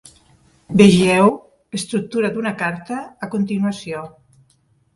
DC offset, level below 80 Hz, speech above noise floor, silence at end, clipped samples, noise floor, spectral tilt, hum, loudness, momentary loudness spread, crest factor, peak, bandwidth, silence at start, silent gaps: under 0.1%; -52 dBFS; 43 dB; 0.85 s; under 0.1%; -60 dBFS; -6 dB/octave; none; -18 LUFS; 18 LU; 18 dB; 0 dBFS; 11.5 kHz; 0.7 s; none